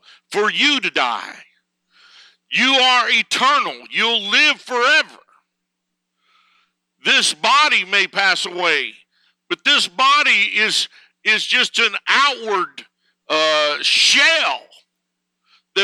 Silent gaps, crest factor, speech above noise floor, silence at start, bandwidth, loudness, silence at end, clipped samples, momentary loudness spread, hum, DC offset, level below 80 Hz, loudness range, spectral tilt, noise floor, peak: none; 16 dB; 60 dB; 0.3 s; 16 kHz; -15 LUFS; 0 s; under 0.1%; 10 LU; none; under 0.1%; -86 dBFS; 3 LU; 0 dB/octave; -77 dBFS; -2 dBFS